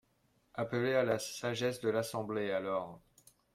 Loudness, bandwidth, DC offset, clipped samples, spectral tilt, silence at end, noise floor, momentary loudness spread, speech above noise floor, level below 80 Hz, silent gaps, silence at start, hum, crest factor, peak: -35 LUFS; 16 kHz; under 0.1%; under 0.1%; -5 dB/octave; 0.55 s; -74 dBFS; 8 LU; 39 dB; -72 dBFS; none; 0.55 s; none; 18 dB; -18 dBFS